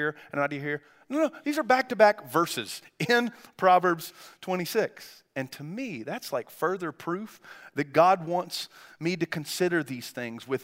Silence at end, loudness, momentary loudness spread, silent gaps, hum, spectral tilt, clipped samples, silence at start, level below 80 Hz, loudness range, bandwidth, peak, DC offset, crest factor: 0 s; -28 LUFS; 15 LU; none; none; -4.5 dB/octave; under 0.1%; 0 s; -80 dBFS; 7 LU; 16 kHz; -6 dBFS; under 0.1%; 22 dB